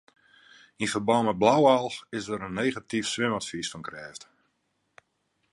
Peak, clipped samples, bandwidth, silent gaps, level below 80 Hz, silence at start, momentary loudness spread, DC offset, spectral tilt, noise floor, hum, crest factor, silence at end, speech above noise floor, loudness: -6 dBFS; under 0.1%; 11.5 kHz; none; -64 dBFS; 0.8 s; 18 LU; under 0.1%; -4.5 dB/octave; -75 dBFS; none; 22 dB; 1.3 s; 49 dB; -26 LUFS